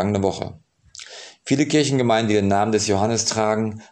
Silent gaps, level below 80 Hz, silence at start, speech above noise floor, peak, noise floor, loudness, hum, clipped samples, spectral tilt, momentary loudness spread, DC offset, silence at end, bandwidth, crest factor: none; -60 dBFS; 0 s; 23 dB; -4 dBFS; -43 dBFS; -20 LUFS; none; under 0.1%; -4.5 dB/octave; 18 LU; under 0.1%; 0.1 s; 11 kHz; 16 dB